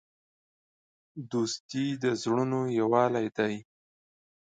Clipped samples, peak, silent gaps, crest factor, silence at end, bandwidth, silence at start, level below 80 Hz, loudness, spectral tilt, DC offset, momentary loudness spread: under 0.1%; -10 dBFS; 1.60-1.69 s; 20 dB; 0.85 s; 9.4 kHz; 1.15 s; -74 dBFS; -29 LUFS; -5.5 dB/octave; under 0.1%; 11 LU